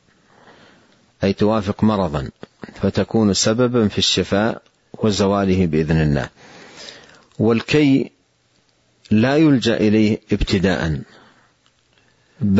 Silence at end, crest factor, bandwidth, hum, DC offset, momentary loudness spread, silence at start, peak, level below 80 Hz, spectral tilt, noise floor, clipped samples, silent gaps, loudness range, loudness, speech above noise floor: 0 s; 16 dB; 8 kHz; none; under 0.1%; 16 LU; 1.2 s; -4 dBFS; -40 dBFS; -5.5 dB/octave; -61 dBFS; under 0.1%; none; 3 LU; -18 LUFS; 44 dB